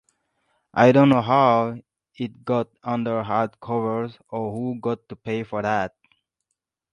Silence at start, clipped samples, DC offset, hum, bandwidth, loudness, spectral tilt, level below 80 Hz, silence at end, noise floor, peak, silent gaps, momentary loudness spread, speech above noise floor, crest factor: 0.75 s; under 0.1%; under 0.1%; none; 9.6 kHz; -22 LUFS; -8 dB/octave; -62 dBFS; 1.05 s; -81 dBFS; -2 dBFS; none; 15 LU; 59 dB; 22 dB